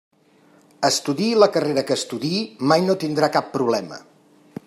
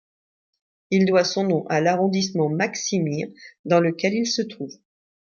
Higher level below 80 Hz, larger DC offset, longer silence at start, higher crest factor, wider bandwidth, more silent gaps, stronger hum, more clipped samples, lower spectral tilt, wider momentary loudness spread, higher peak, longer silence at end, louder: about the same, -68 dBFS vs -68 dBFS; neither; about the same, 0.8 s vs 0.9 s; about the same, 20 dB vs 18 dB; first, 15.5 kHz vs 7.2 kHz; second, none vs 3.59-3.64 s; neither; neither; about the same, -4.5 dB/octave vs -5 dB/octave; second, 8 LU vs 12 LU; first, -2 dBFS vs -6 dBFS; about the same, 0.65 s vs 0.6 s; about the same, -20 LUFS vs -22 LUFS